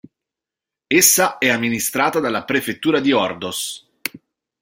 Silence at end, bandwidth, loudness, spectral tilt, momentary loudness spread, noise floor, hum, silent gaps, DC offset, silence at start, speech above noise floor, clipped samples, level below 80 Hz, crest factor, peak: 0.45 s; 16.5 kHz; -17 LUFS; -2.5 dB/octave; 16 LU; -87 dBFS; none; none; under 0.1%; 0.9 s; 69 dB; under 0.1%; -60 dBFS; 20 dB; 0 dBFS